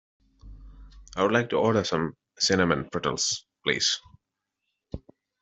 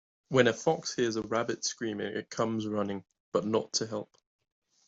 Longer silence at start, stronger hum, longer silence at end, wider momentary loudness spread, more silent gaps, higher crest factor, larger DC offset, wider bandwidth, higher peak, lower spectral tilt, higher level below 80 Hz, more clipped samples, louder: first, 0.45 s vs 0.3 s; neither; second, 0.45 s vs 0.85 s; first, 18 LU vs 10 LU; second, none vs 3.20-3.32 s; about the same, 22 dB vs 22 dB; neither; about the same, 8.2 kHz vs 8.2 kHz; first, -6 dBFS vs -10 dBFS; about the same, -3.5 dB/octave vs -4 dB/octave; first, -52 dBFS vs -70 dBFS; neither; first, -26 LUFS vs -31 LUFS